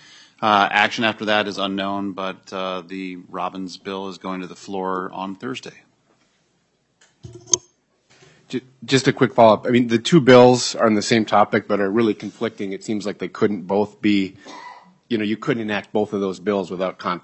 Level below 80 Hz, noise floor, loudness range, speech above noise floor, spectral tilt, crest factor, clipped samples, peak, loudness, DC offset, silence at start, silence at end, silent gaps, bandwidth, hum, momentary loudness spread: -64 dBFS; -66 dBFS; 14 LU; 46 dB; -4.5 dB/octave; 20 dB; under 0.1%; 0 dBFS; -20 LUFS; under 0.1%; 0.4 s; 0.05 s; none; 8.6 kHz; none; 16 LU